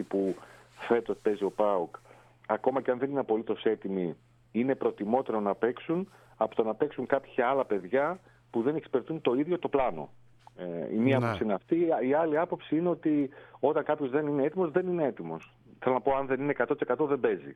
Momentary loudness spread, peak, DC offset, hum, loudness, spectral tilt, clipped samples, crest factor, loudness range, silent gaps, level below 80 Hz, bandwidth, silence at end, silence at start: 9 LU; -12 dBFS; under 0.1%; none; -30 LUFS; -8.5 dB/octave; under 0.1%; 18 dB; 2 LU; none; -64 dBFS; 9.4 kHz; 0 s; 0 s